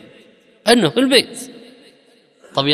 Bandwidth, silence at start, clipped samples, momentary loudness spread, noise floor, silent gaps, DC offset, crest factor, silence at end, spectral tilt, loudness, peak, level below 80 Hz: 14.5 kHz; 0.65 s; under 0.1%; 18 LU; -53 dBFS; none; under 0.1%; 20 dB; 0 s; -3.5 dB/octave; -16 LUFS; 0 dBFS; -60 dBFS